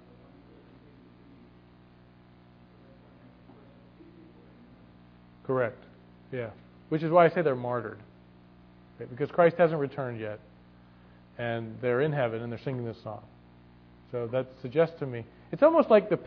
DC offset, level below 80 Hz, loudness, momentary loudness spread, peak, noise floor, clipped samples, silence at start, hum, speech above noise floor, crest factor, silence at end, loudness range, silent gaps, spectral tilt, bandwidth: under 0.1%; -64 dBFS; -28 LUFS; 19 LU; -6 dBFS; -56 dBFS; under 0.1%; 5.5 s; 60 Hz at -55 dBFS; 29 dB; 24 dB; 0 s; 10 LU; none; -6 dB/octave; 5.4 kHz